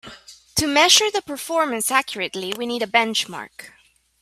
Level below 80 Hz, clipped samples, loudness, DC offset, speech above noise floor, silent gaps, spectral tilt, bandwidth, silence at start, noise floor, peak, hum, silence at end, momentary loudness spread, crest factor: -54 dBFS; under 0.1%; -19 LUFS; under 0.1%; 23 dB; none; -1 dB/octave; 16 kHz; 0.05 s; -44 dBFS; 0 dBFS; none; 0.5 s; 15 LU; 22 dB